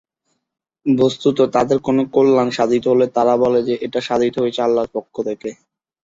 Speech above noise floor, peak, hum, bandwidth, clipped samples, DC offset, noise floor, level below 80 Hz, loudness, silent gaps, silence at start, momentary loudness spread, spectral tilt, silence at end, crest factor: 55 dB; -2 dBFS; none; 7.8 kHz; under 0.1%; under 0.1%; -71 dBFS; -56 dBFS; -17 LUFS; none; 0.85 s; 10 LU; -6.5 dB/octave; 0.5 s; 16 dB